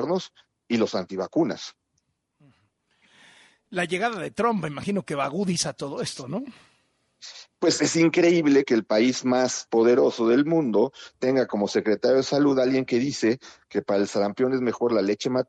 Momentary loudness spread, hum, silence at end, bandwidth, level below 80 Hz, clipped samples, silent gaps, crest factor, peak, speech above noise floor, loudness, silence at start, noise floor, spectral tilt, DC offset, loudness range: 12 LU; none; 0.05 s; 11.5 kHz; -68 dBFS; under 0.1%; none; 16 dB; -8 dBFS; 51 dB; -24 LUFS; 0 s; -74 dBFS; -5 dB/octave; under 0.1%; 10 LU